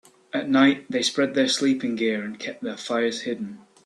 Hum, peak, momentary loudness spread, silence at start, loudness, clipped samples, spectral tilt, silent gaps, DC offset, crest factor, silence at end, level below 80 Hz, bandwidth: none; -6 dBFS; 13 LU; 0.35 s; -24 LUFS; under 0.1%; -3.5 dB/octave; none; under 0.1%; 18 dB; 0.3 s; -70 dBFS; 11.5 kHz